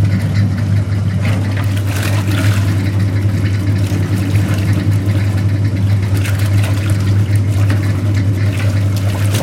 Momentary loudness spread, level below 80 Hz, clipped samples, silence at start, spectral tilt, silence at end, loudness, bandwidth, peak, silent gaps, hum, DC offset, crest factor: 2 LU; -36 dBFS; under 0.1%; 0 s; -6.5 dB/octave; 0 s; -15 LUFS; 15.5 kHz; -2 dBFS; none; none; under 0.1%; 12 dB